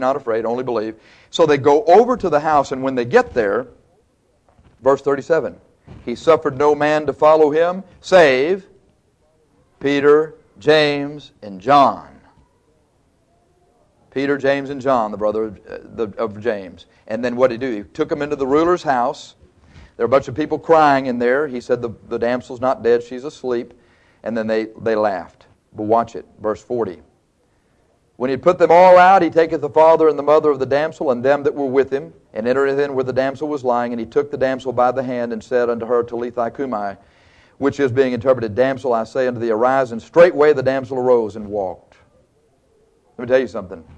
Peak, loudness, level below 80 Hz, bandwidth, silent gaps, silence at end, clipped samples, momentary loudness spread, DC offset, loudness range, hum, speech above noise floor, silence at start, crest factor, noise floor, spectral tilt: 0 dBFS; -17 LUFS; -54 dBFS; 9 kHz; none; 0.15 s; under 0.1%; 14 LU; under 0.1%; 8 LU; none; 44 dB; 0 s; 16 dB; -61 dBFS; -6 dB/octave